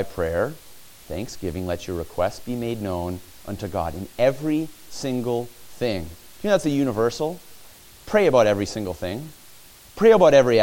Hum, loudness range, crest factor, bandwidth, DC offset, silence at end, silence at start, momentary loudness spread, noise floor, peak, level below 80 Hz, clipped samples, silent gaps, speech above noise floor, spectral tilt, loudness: none; 7 LU; 20 dB; 17 kHz; under 0.1%; 0 s; 0 s; 17 LU; -47 dBFS; -4 dBFS; -48 dBFS; under 0.1%; none; 26 dB; -5.5 dB/octave; -23 LUFS